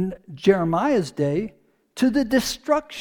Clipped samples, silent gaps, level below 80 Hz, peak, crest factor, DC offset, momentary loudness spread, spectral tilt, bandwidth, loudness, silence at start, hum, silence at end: under 0.1%; none; -50 dBFS; -4 dBFS; 18 dB; under 0.1%; 9 LU; -5.5 dB/octave; 19 kHz; -22 LUFS; 0 s; none; 0 s